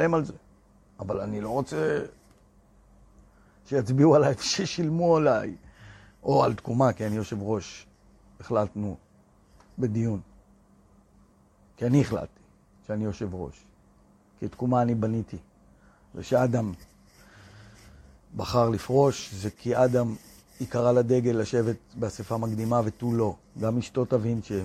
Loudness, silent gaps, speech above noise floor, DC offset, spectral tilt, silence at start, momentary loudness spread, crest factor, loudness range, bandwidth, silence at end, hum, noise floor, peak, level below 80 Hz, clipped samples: -26 LUFS; none; 34 dB; under 0.1%; -6.5 dB/octave; 0 s; 16 LU; 20 dB; 8 LU; 14 kHz; 0 s; none; -60 dBFS; -8 dBFS; -56 dBFS; under 0.1%